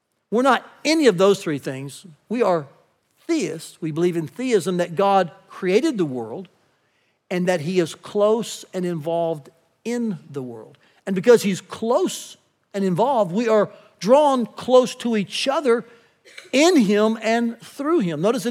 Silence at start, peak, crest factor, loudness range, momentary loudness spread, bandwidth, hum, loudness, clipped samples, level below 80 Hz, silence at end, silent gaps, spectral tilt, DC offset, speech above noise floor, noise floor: 0.3 s; -4 dBFS; 18 dB; 5 LU; 15 LU; 16 kHz; none; -21 LUFS; under 0.1%; -82 dBFS; 0 s; none; -5 dB/octave; under 0.1%; 46 dB; -66 dBFS